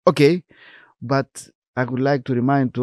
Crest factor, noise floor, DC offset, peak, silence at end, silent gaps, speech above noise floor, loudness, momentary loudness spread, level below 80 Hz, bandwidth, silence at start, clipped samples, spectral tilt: 20 dB; -49 dBFS; under 0.1%; 0 dBFS; 0 s; 1.55-1.62 s, 1.68-1.74 s; 30 dB; -20 LUFS; 16 LU; -62 dBFS; 12.5 kHz; 0.05 s; under 0.1%; -7 dB/octave